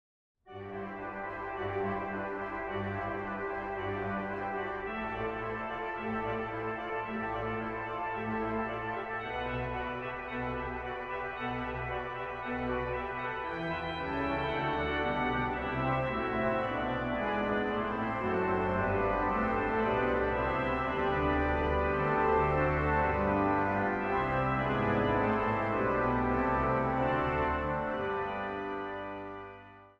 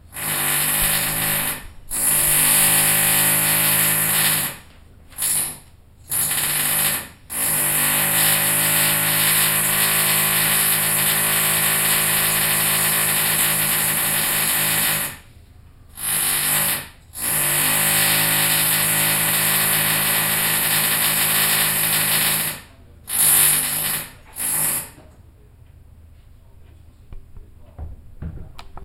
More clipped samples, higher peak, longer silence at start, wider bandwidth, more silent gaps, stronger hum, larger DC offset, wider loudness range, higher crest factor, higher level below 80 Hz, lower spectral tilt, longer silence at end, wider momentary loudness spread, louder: neither; second, -18 dBFS vs -2 dBFS; first, 0.45 s vs 0.1 s; second, 7.8 kHz vs 16 kHz; neither; neither; neither; about the same, 7 LU vs 5 LU; about the same, 16 dB vs 18 dB; about the same, -46 dBFS vs -44 dBFS; first, -8 dB/octave vs -0.5 dB/octave; about the same, 0.1 s vs 0 s; about the same, 8 LU vs 10 LU; second, -32 LUFS vs -16 LUFS